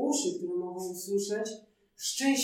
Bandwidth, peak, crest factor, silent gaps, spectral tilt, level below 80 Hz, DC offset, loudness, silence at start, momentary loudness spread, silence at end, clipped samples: 17.5 kHz; -16 dBFS; 16 dB; none; -2.5 dB/octave; -82 dBFS; under 0.1%; -33 LUFS; 0 s; 8 LU; 0 s; under 0.1%